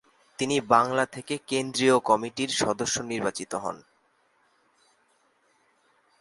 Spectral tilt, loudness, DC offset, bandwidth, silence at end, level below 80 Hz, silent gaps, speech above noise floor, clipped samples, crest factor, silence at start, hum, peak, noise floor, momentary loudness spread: -3.5 dB/octave; -26 LUFS; under 0.1%; 11.5 kHz; 2.45 s; -64 dBFS; none; 41 dB; under 0.1%; 24 dB; 0.4 s; none; -4 dBFS; -67 dBFS; 12 LU